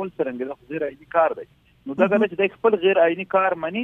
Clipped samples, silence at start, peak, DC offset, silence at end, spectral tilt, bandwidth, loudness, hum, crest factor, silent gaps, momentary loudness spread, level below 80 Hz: under 0.1%; 0 s; -4 dBFS; under 0.1%; 0 s; -8 dB/octave; 3.8 kHz; -21 LUFS; none; 18 dB; none; 13 LU; -64 dBFS